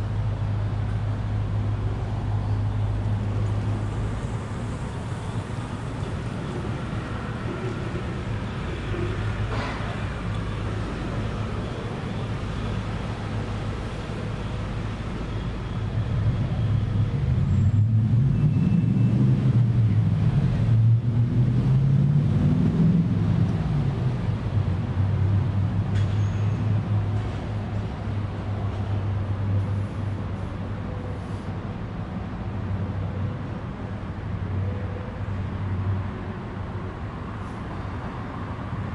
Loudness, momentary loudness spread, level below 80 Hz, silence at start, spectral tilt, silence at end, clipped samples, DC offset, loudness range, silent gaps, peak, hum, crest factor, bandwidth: -26 LUFS; 11 LU; -36 dBFS; 0 s; -8.5 dB/octave; 0 s; under 0.1%; under 0.1%; 10 LU; none; -10 dBFS; none; 14 dB; 9.4 kHz